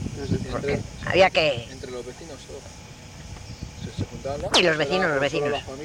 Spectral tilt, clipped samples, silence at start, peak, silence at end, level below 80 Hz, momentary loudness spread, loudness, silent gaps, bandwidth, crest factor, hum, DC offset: -4 dB/octave; under 0.1%; 0 s; -6 dBFS; 0 s; -44 dBFS; 21 LU; -23 LUFS; none; 16 kHz; 20 dB; none; under 0.1%